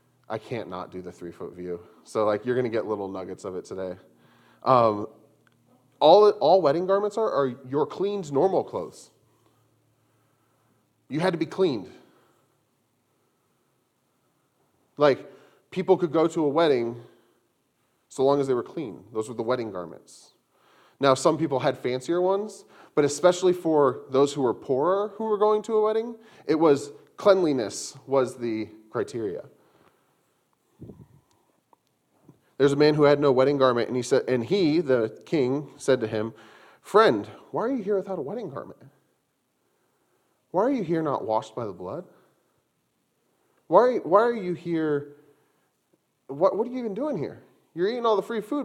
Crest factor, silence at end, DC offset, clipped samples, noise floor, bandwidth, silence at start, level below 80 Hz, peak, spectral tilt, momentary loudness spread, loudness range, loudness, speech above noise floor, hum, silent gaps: 22 dB; 0 s; under 0.1%; under 0.1%; -73 dBFS; 12.5 kHz; 0.3 s; -72 dBFS; -2 dBFS; -6 dB/octave; 16 LU; 9 LU; -24 LUFS; 49 dB; none; none